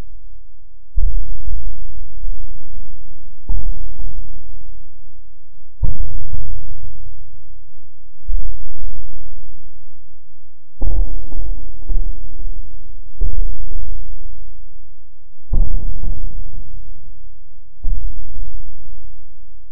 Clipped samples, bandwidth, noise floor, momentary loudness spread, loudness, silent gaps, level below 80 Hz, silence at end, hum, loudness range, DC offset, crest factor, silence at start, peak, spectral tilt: under 0.1%; 1.1 kHz; -37 dBFS; 22 LU; -31 LUFS; none; -24 dBFS; 0 s; none; 6 LU; 40%; 10 dB; 0 s; 0 dBFS; -14.5 dB/octave